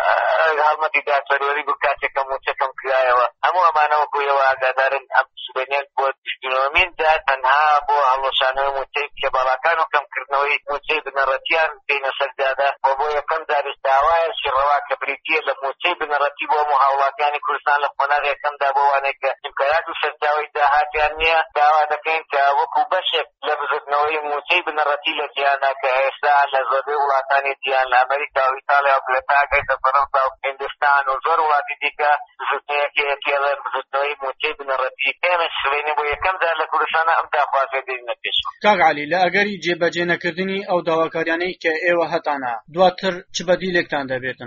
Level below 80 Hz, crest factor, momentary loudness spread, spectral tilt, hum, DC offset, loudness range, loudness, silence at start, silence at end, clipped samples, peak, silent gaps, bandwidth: -52 dBFS; 18 dB; 7 LU; 0 dB/octave; none; under 0.1%; 2 LU; -19 LUFS; 0 s; 0 s; under 0.1%; -2 dBFS; 6.18-6.22 s; 7.2 kHz